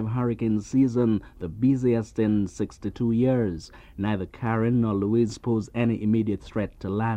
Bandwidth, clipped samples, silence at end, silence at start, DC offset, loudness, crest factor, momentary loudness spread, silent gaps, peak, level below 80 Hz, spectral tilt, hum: 9 kHz; under 0.1%; 0 s; 0 s; under 0.1%; -25 LUFS; 14 dB; 8 LU; none; -10 dBFS; -48 dBFS; -8.5 dB/octave; none